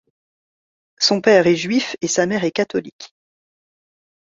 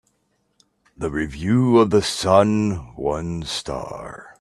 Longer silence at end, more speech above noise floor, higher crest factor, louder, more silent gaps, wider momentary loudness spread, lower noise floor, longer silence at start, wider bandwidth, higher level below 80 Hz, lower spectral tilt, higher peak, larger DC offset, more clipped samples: first, 1.25 s vs 0.1 s; first, over 72 dB vs 48 dB; about the same, 18 dB vs 20 dB; first, -17 LUFS vs -20 LUFS; first, 2.92-2.99 s vs none; second, 10 LU vs 15 LU; first, under -90 dBFS vs -68 dBFS; about the same, 1 s vs 1 s; second, 7.8 kHz vs 13 kHz; second, -62 dBFS vs -46 dBFS; second, -3.5 dB/octave vs -6 dB/octave; about the same, -2 dBFS vs 0 dBFS; neither; neither